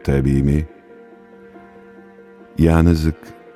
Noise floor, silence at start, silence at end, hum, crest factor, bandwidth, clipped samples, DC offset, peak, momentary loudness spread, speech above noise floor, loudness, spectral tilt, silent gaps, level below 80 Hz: -43 dBFS; 0.05 s; 0.25 s; none; 18 dB; 13.5 kHz; under 0.1%; under 0.1%; -2 dBFS; 18 LU; 28 dB; -17 LUFS; -8.5 dB/octave; none; -28 dBFS